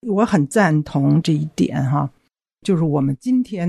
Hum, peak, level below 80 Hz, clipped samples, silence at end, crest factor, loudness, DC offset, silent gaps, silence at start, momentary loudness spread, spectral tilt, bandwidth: none; -2 dBFS; -54 dBFS; under 0.1%; 0 s; 16 dB; -19 LUFS; under 0.1%; none; 0.05 s; 5 LU; -7 dB/octave; 12.5 kHz